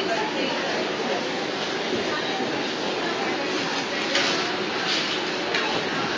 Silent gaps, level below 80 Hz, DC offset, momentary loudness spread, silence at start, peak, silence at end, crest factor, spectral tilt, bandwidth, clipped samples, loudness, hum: none; -62 dBFS; under 0.1%; 3 LU; 0 s; -8 dBFS; 0 s; 18 dB; -3 dB/octave; 8 kHz; under 0.1%; -24 LUFS; none